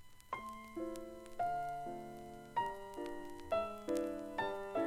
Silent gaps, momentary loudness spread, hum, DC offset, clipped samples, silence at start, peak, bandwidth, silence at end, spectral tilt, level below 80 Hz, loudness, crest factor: none; 10 LU; none; under 0.1%; under 0.1%; 0 s; -22 dBFS; 16.5 kHz; 0 s; -5 dB/octave; -62 dBFS; -43 LUFS; 20 dB